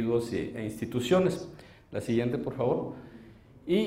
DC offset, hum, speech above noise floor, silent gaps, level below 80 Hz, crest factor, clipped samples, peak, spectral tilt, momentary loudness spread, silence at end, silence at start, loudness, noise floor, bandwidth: under 0.1%; none; 23 dB; none; -58 dBFS; 18 dB; under 0.1%; -12 dBFS; -6.5 dB/octave; 19 LU; 0 s; 0 s; -30 LUFS; -52 dBFS; 16 kHz